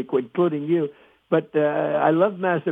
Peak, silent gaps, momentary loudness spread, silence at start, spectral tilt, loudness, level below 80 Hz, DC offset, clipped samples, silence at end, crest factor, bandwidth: -6 dBFS; none; 5 LU; 0 s; -9.5 dB/octave; -22 LUFS; -76 dBFS; under 0.1%; under 0.1%; 0 s; 16 dB; 3.9 kHz